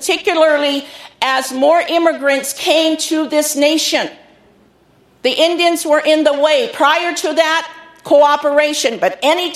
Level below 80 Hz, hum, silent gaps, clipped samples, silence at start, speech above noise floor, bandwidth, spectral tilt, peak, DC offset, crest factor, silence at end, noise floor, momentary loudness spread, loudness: -64 dBFS; none; none; under 0.1%; 0 s; 38 dB; 15 kHz; -1 dB/octave; 0 dBFS; under 0.1%; 14 dB; 0 s; -51 dBFS; 7 LU; -14 LUFS